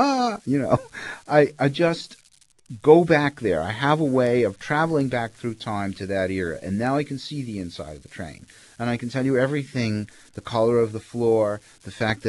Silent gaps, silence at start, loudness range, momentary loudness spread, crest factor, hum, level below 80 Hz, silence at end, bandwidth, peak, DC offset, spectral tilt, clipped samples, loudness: none; 0 s; 7 LU; 15 LU; 22 dB; none; -56 dBFS; 0 s; 12 kHz; -2 dBFS; under 0.1%; -6.5 dB/octave; under 0.1%; -23 LUFS